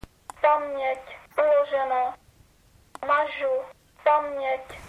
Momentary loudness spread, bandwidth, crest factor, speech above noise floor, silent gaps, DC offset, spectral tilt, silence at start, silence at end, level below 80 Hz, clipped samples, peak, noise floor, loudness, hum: 11 LU; 12.5 kHz; 18 dB; 34 dB; none; under 0.1%; -4 dB/octave; 0.4 s; 0 s; -58 dBFS; under 0.1%; -8 dBFS; -58 dBFS; -25 LUFS; none